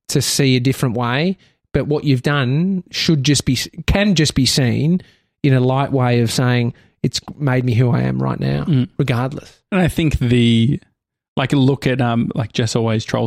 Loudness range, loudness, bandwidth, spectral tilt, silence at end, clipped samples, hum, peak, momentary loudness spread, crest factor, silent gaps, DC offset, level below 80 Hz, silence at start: 2 LU; -17 LUFS; 15 kHz; -5.5 dB/octave; 0 s; under 0.1%; none; -4 dBFS; 7 LU; 14 dB; 11.28-11.36 s; under 0.1%; -36 dBFS; 0.1 s